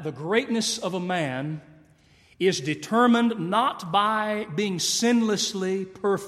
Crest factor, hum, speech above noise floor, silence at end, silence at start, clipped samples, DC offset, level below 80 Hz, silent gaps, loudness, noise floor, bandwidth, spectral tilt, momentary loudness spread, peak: 18 dB; none; 33 dB; 0 s; 0 s; under 0.1%; under 0.1%; -68 dBFS; none; -24 LUFS; -57 dBFS; 14 kHz; -4 dB/octave; 8 LU; -8 dBFS